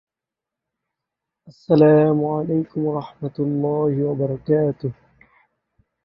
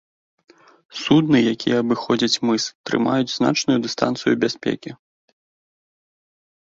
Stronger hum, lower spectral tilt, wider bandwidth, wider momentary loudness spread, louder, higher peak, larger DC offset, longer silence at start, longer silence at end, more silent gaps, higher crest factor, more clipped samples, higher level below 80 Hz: neither; first, -11 dB/octave vs -4.5 dB/octave; second, 5.6 kHz vs 7.8 kHz; first, 13 LU vs 9 LU; about the same, -20 LUFS vs -20 LUFS; about the same, -2 dBFS vs -4 dBFS; neither; first, 1.45 s vs 0.95 s; second, 1.1 s vs 1.7 s; second, none vs 2.75-2.84 s; about the same, 20 dB vs 18 dB; neither; about the same, -60 dBFS vs -60 dBFS